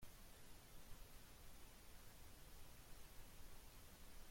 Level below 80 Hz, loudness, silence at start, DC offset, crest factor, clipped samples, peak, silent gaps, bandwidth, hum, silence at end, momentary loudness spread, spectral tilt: -64 dBFS; -64 LUFS; 0 s; under 0.1%; 14 dB; under 0.1%; -44 dBFS; none; 16.5 kHz; none; 0 s; 1 LU; -3 dB/octave